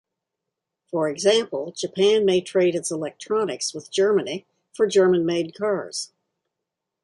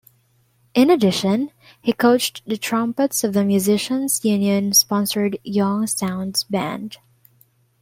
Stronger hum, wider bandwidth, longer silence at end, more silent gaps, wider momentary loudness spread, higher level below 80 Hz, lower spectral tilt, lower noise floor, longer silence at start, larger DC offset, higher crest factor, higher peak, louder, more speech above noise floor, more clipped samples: neither; second, 11.5 kHz vs 16.5 kHz; first, 1 s vs 0.85 s; neither; first, 12 LU vs 9 LU; second, -70 dBFS vs -62 dBFS; about the same, -4 dB/octave vs -4 dB/octave; first, -83 dBFS vs -61 dBFS; first, 0.95 s vs 0.75 s; neither; about the same, 18 dB vs 16 dB; about the same, -6 dBFS vs -4 dBFS; second, -22 LUFS vs -19 LUFS; first, 62 dB vs 42 dB; neither